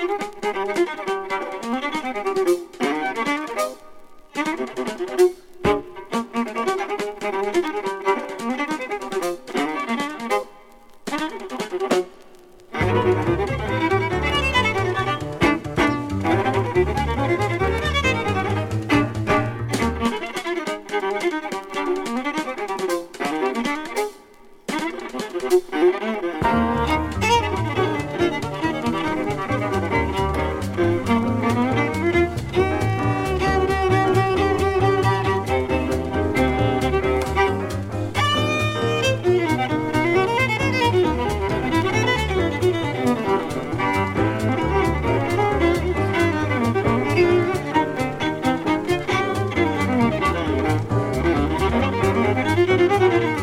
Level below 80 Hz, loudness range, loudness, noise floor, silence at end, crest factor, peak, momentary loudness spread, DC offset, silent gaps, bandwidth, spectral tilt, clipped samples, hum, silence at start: -36 dBFS; 5 LU; -21 LUFS; -46 dBFS; 0 s; 16 dB; -4 dBFS; 7 LU; under 0.1%; none; 16 kHz; -6 dB/octave; under 0.1%; none; 0 s